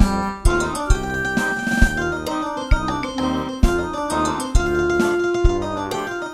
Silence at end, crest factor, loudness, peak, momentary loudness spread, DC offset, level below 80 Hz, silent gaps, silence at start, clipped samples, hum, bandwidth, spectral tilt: 0 s; 20 dB; -21 LUFS; 0 dBFS; 5 LU; under 0.1%; -24 dBFS; none; 0 s; under 0.1%; none; 15 kHz; -5.5 dB/octave